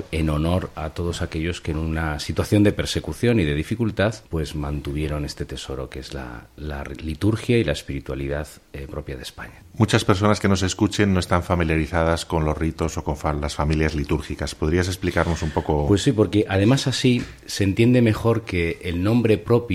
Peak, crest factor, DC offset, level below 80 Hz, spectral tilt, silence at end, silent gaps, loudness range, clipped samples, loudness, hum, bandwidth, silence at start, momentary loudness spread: -2 dBFS; 20 dB; under 0.1%; -34 dBFS; -6 dB/octave; 0 s; none; 7 LU; under 0.1%; -22 LUFS; none; 15 kHz; 0 s; 13 LU